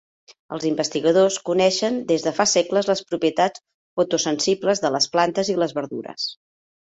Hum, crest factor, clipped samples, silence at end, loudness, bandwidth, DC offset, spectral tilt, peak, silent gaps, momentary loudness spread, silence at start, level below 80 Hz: none; 18 dB; under 0.1%; 0.5 s; -21 LUFS; 8.2 kHz; under 0.1%; -3.5 dB/octave; -4 dBFS; 3.74-3.97 s; 10 LU; 0.5 s; -64 dBFS